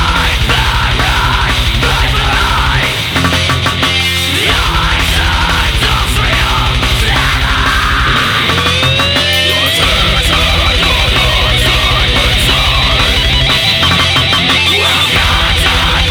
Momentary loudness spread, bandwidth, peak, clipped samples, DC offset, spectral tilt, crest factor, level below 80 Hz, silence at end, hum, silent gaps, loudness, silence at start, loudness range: 3 LU; over 20 kHz; 0 dBFS; under 0.1%; under 0.1%; -3.5 dB/octave; 10 dB; -18 dBFS; 0 s; none; none; -9 LUFS; 0 s; 2 LU